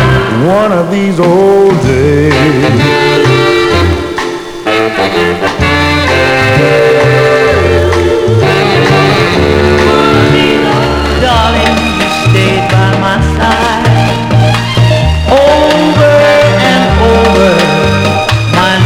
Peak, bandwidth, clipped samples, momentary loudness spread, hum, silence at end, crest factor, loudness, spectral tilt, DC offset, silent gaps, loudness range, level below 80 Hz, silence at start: 0 dBFS; 16 kHz; 1%; 4 LU; none; 0 s; 8 dB; -8 LUFS; -6 dB/octave; under 0.1%; none; 2 LU; -22 dBFS; 0 s